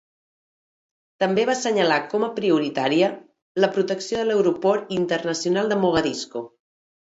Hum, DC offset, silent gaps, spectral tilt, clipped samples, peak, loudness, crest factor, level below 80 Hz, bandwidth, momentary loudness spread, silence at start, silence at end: none; under 0.1%; 3.42-3.55 s; -4.5 dB/octave; under 0.1%; -6 dBFS; -22 LUFS; 18 dB; -60 dBFS; 8 kHz; 8 LU; 1.2 s; 0.65 s